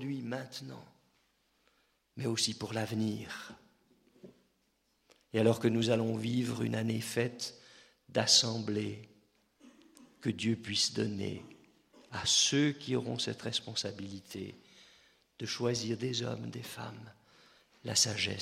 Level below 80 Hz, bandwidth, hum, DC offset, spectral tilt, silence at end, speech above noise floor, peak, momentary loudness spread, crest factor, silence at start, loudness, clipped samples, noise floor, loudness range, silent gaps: -72 dBFS; 15.5 kHz; none; under 0.1%; -3.5 dB/octave; 0 s; 42 dB; -12 dBFS; 18 LU; 24 dB; 0 s; -32 LUFS; under 0.1%; -76 dBFS; 6 LU; none